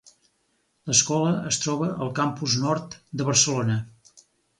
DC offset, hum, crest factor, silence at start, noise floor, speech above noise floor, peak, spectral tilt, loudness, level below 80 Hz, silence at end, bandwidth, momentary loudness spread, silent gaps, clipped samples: under 0.1%; none; 22 dB; 0.85 s; -70 dBFS; 46 dB; -4 dBFS; -3.5 dB/octave; -23 LUFS; -60 dBFS; 0.4 s; 11.5 kHz; 10 LU; none; under 0.1%